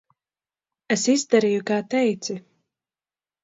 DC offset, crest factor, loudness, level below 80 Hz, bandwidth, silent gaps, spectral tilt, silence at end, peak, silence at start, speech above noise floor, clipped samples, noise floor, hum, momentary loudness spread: under 0.1%; 20 dB; -22 LUFS; -74 dBFS; 8 kHz; none; -4 dB/octave; 1.05 s; -4 dBFS; 0.9 s; over 69 dB; under 0.1%; under -90 dBFS; none; 12 LU